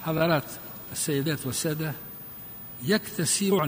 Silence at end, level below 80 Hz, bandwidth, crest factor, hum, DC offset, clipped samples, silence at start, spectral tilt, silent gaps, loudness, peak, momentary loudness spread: 0 s; -60 dBFS; 15.5 kHz; 18 dB; none; under 0.1%; under 0.1%; 0 s; -4 dB/octave; none; -27 LUFS; -10 dBFS; 14 LU